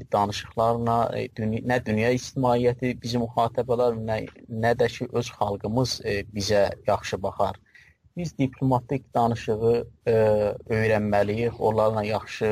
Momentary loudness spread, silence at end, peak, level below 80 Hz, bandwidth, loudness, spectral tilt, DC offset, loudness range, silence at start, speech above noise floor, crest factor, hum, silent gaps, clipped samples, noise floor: 7 LU; 0 s; -10 dBFS; -50 dBFS; 15.5 kHz; -25 LUFS; -6 dB/octave; under 0.1%; 3 LU; 0 s; 31 dB; 14 dB; none; none; under 0.1%; -56 dBFS